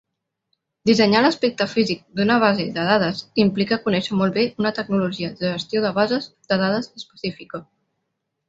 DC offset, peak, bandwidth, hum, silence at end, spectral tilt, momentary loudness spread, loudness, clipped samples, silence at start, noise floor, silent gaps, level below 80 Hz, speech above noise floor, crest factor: under 0.1%; -2 dBFS; 7.8 kHz; none; 0.85 s; -6 dB/octave; 12 LU; -20 LUFS; under 0.1%; 0.85 s; -77 dBFS; none; -60 dBFS; 56 dB; 20 dB